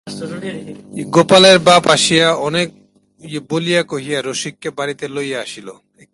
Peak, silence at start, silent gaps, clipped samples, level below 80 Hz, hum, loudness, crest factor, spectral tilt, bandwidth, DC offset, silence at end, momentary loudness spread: 0 dBFS; 0.05 s; none; under 0.1%; -56 dBFS; none; -14 LUFS; 16 dB; -3.5 dB/octave; 11.5 kHz; under 0.1%; 0.4 s; 21 LU